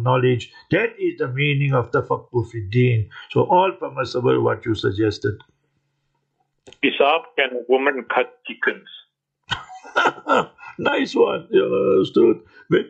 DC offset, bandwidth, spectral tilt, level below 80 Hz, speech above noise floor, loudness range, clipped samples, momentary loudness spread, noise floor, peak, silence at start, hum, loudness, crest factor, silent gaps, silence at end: under 0.1%; 8.2 kHz; -7 dB/octave; -58 dBFS; 52 dB; 3 LU; under 0.1%; 9 LU; -71 dBFS; -4 dBFS; 0 s; none; -20 LUFS; 16 dB; none; 0 s